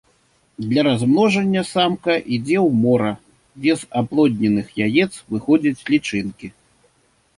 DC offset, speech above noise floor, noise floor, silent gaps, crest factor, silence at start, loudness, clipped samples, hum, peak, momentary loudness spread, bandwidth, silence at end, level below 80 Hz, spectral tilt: under 0.1%; 43 dB; -61 dBFS; none; 16 dB; 0.6 s; -19 LUFS; under 0.1%; none; -4 dBFS; 10 LU; 11.5 kHz; 0.85 s; -56 dBFS; -6 dB/octave